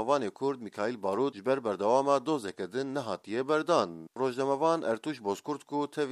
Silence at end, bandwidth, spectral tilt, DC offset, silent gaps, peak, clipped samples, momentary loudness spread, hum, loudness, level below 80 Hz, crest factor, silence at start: 0 s; 13.5 kHz; -5.5 dB/octave; under 0.1%; none; -12 dBFS; under 0.1%; 8 LU; none; -31 LUFS; -82 dBFS; 18 dB; 0 s